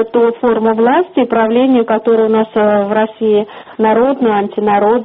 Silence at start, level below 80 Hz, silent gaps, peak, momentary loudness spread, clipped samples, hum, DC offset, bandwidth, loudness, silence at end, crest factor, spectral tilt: 0 s; -52 dBFS; none; 0 dBFS; 3 LU; under 0.1%; none; under 0.1%; 4 kHz; -12 LUFS; 0 s; 12 dB; -4.5 dB/octave